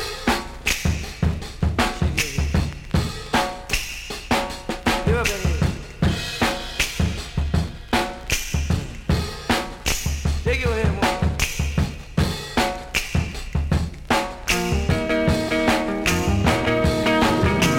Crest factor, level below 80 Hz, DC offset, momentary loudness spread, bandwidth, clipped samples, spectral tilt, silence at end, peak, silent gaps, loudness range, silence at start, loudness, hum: 16 dB; -30 dBFS; under 0.1%; 6 LU; 17 kHz; under 0.1%; -4.5 dB/octave; 0 s; -6 dBFS; none; 3 LU; 0 s; -22 LUFS; none